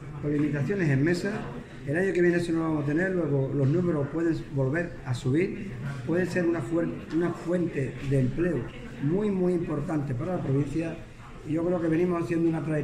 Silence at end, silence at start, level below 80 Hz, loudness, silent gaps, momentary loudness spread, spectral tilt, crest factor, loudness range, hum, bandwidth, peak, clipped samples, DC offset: 0 s; 0 s; -48 dBFS; -28 LUFS; none; 8 LU; -8 dB/octave; 14 dB; 2 LU; none; 10.5 kHz; -12 dBFS; under 0.1%; under 0.1%